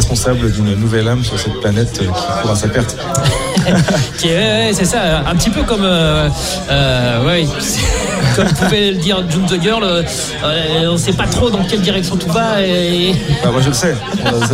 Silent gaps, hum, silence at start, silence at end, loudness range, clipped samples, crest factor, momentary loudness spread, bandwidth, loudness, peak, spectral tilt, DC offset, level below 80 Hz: none; none; 0 s; 0 s; 2 LU; under 0.1%; 12 dB; 4 LU; 16 kHz; -14 LUFS; -2 dBFS; -4.5 dB/octave; under 0.1%; -26 dBFS